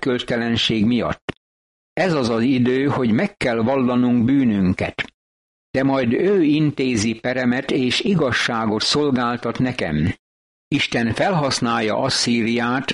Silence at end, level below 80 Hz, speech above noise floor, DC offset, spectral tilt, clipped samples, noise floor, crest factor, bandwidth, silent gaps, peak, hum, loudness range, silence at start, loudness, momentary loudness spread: 0 s; -48 dBFS; over 71 dB; under 0.1%; -5 dB/octave; under 0.1%; under -90 dBFS; 14 dB; 11.5 kHz; 1.22-1.28 s, 1.37-1.96 s, 5.14-5.74 s, 10.19-10.71 s; -6 dBFS; none; 2 LU; 0 s; -19 LUFS; 6 LU